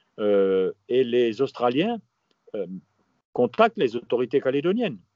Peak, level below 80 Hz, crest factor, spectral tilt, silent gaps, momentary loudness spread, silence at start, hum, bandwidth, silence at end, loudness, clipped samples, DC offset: -4 dBFS; -76 dBFS; 20 dB; -4.5 dB/octave; 3.25-3.33 s; 13 LU; 0.2 s; none; 7.2 kHz; 0.2 s; -24 LUFS; under 0.1%; under 0.1%